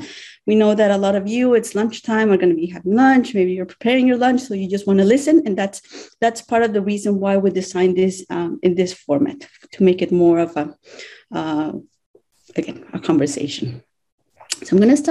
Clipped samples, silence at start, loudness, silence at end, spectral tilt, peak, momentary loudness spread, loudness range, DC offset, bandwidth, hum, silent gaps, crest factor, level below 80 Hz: under 0.1%; 0 s; -18 LUFS; 0 s; -6 dB/octave; -4 dBFS; 14 LU; 8 LU; under 0.1%; 12 kHz; none; 12.06-12.14 s, 14.12-14.18 s; 14 dB; -62 dBFS